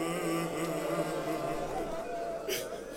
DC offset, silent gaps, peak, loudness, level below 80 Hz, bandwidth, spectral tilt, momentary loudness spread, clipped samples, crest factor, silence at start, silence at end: under 0.1%; none; -20 dBFS; -35 LUFS; -54 dBFS; 17 kHz; -4.5 dB/octave; 4 LU; under 0.1%; 14 dB; 0 s; 0 s